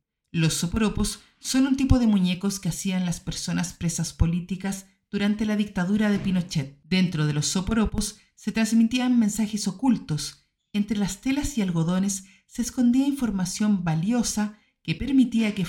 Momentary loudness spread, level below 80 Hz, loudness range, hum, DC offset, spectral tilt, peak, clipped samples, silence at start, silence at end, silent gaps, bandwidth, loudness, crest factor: 9 LU; -40 dBFS; 3 LU; none; under 0.1%; -5 dB/octave; -4 dBFS; under 0.1%; 0.35 s; 0 s; none; 17 kHz; -25 LUFS; 20 dB